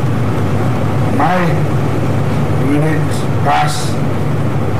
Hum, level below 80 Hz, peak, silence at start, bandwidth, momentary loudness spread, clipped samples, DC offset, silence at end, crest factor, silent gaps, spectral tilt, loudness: none; -36 dBFS; -2 dBFS; 0 s; 15.5 kHz; 4 LU; under 0.1%; 10%; 0 s; 10 dB; none; -7 dB/octave; -15 LUFS